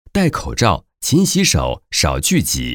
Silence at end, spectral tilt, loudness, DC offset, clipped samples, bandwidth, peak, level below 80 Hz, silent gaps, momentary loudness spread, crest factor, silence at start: 0 s; -4 dB/octave; -16 LUFS; under 0.1%; under 0.1%; over 20 kHz; -2 dBFS; -32 dBFS; none; 5 LU; 16 dB; 0.15 s